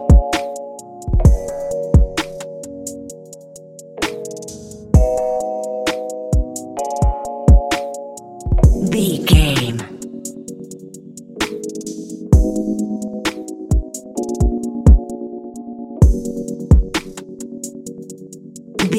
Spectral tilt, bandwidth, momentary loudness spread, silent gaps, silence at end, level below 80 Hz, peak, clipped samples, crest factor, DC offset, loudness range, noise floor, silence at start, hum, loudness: -6 dB/octave; 15 kHz; 20 LU; none; 0 s; -20 dBFS; 0 dBFS; under 0.1%; 18 dB; under 0.1%; 5 LU; -38 dBFS; 0 s; none; -18 LUFS